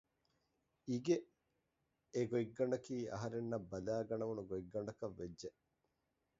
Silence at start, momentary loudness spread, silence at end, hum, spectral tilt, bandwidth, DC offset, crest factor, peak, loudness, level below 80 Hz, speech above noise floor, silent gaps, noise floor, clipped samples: 0.85 s; 10 LU; 0.9 s; none; -7 dB/octave; 7.6 kHz; under 0.1%; 20 dB; -24 dBFS; -42 LUFS; -72 dBFS; 44 dB; none; -86 dBFS; under 0.1%